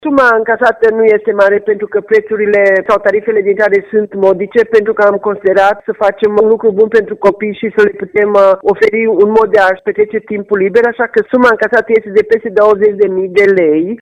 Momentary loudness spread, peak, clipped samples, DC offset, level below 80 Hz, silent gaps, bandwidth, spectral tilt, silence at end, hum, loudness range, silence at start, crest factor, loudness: 5 LU; 0 dBFS; 0.2%; under 0.1%; -50 dBFS; none; 7.6 kHz; -6.5 dB/octave; 0.05 s; none; 1 LU; 0.05 s; 10 dB; -10 LUFS